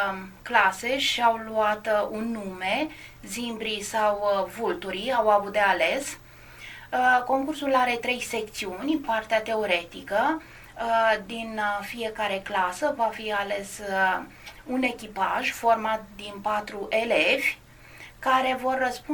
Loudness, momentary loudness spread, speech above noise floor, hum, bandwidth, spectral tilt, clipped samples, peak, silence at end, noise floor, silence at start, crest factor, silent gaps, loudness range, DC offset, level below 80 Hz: -26 LUFS; 11 LU; 21 dB; none; 17.5 kHz; -3 dB/octave; under 0.1%; -4 dBFS; 0 s; -47 dBFS; 0 s; 22 dB; none; 3 LU; under 0.1%; -56 dBFS